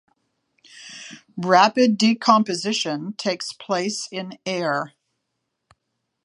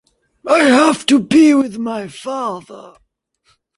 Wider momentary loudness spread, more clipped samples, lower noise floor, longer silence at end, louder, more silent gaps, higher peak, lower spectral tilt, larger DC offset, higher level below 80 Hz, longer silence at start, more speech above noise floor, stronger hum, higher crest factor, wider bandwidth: first, 21 LU vs 15 LU; neither; first, -77 dBFS vs -61 dBFS; first, 1.35 s vs 0.9 s; second, -21 LUFS vs -14 LUFS; neither; about the same, -2 dBFS vs 0 dBFS; about the same, -4 dB/octave vs -4 dB/octave; neither; second, -76 dBFS vs -58 dBFS; first, 0.75 s vs 0.45 s; first, 57 dB vs 47 dB; neither; first, 22 dB vs 14 dB; about the same, 11 kHz vs 11.5 kHz